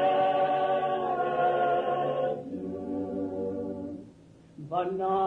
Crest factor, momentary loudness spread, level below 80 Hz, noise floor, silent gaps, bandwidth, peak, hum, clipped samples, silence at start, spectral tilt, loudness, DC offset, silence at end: 12 dB; 11 LU; -66 dBFS; -54 dBFS; none; 5.6 kHz; -16 dBFS; none; under 0.1%; 0 s; -7.5 dB/octave; -29 LUFS; under 0.1%; 0 s